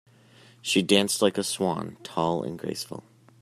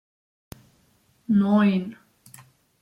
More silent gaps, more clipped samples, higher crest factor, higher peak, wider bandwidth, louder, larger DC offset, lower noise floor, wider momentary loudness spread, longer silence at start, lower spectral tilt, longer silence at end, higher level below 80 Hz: neither; neither; first, 24 dB vs 16 dB; first, -4 dBFS vs -10 dBFS; first, 15 kHz vs 12 kHz; second, -26 LUFS vs -21 LUFS; neither; second, -55 dBFS vs -63 dBFS; second, 15 LU vs 20 LU; second, 0.65 s vs 1.3 s; second, -3.5 dB/octave vs -8 dB/octave; second, 0.4 s vs 0.9 s; second, -68 dBFS vs -62 dBFS